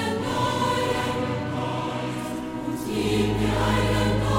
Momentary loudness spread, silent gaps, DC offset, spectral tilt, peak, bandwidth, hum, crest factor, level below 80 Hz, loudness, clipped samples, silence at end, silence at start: 7 LU; none; under 0.1%; -5.5 dB/octave; -10 dBFS; 16.5 kHz; none; 14 dB; -38 dBFS; -25 LUFS; under 0.1%; 0 s; 0 s